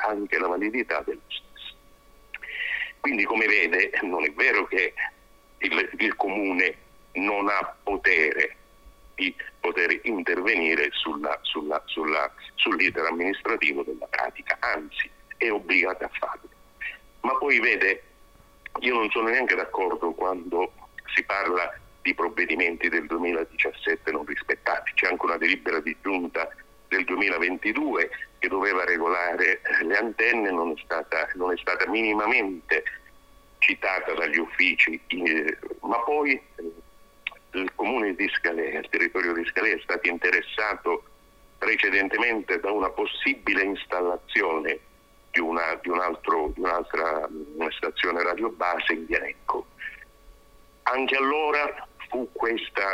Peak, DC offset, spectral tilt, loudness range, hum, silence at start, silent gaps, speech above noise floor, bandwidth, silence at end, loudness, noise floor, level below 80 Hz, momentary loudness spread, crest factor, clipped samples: -4 dBFS; under 0.1%; -4 dB/octave; 4 LU; none; 0 s; none; 28 dB; 16 kHz; 0 s; -25 LUFS; -54 dBFS; -56 dBFS; 10 LU; 22 dB; under 0.1%